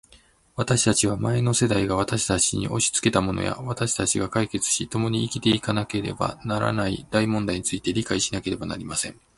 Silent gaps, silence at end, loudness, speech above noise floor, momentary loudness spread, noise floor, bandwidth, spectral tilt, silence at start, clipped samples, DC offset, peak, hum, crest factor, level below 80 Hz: none; 0.25 s; -24 LUFS; 32 dB; 7 LU; -56 dBFS; 11.5 kHz; -4 dB/octave; 0.55 s; under 0.1%; under 0.1%; -4 dBFS; none; 20 dB; -46 dBFS